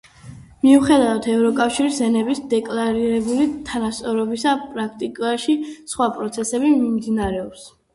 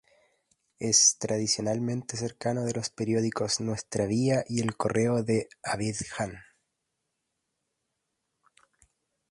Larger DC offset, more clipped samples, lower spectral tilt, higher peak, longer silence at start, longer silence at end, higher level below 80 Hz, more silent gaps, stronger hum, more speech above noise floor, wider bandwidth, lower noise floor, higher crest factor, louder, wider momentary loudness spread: neither; neither; about the same, -4.5 dB/octave vs -3.5 dB/octave; first, -2 dBFS vs -10 dBFS; second, 0.25 s vs 0.8 s; second, 0.25 s vs 2.9 s; first, -48 dBFS vs -62 dBFS; neither; neither; second, 22 dB vs 54 dB; about the same, 11.5 kHz vs 11.5 kHz; second, -41 dBFS vs -82 dBFS; second, 16 dB vs 22 dB; first, -20 LUFS vs -27 LUFS; about the same, 10 LU vs 12 LU